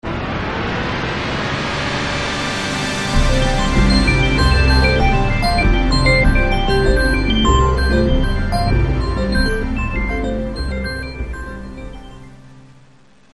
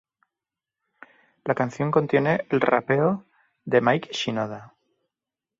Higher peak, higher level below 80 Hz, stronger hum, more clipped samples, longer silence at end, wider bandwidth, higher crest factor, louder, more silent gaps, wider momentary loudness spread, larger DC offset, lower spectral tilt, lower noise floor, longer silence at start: first, 0 dBFS vs -4 dBFS; first, -20 dBFS vs -66 dBFS; neither; neither; second, 0.75 s vs 0.95 s; first, 12 kHz vs 7.8 kHz; second, 16 dB vs 22 dB; first, -17 LUFS vs -23 LUFS; neither; about the same, 10 LU vs 12 LU; first, 0.4% vs under 0.1%; about the same, -5.5 dB/octave vs -6.5 dB/octave; second, -50 dBFS vs -89 dBFS; second, 0.05 s vs 1.45 s